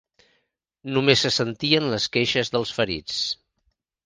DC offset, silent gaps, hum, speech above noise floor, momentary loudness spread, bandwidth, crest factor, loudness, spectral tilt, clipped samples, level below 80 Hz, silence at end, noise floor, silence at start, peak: under 0.1%; none; none; 49 dB; 9 LU; 10 kHz; 24 dB; -22 LUFS; -4 dB/octave; under 0.1%; -56 dBFS; 0.7 s; -72 dBFS; 0.85 s; 0 dBFS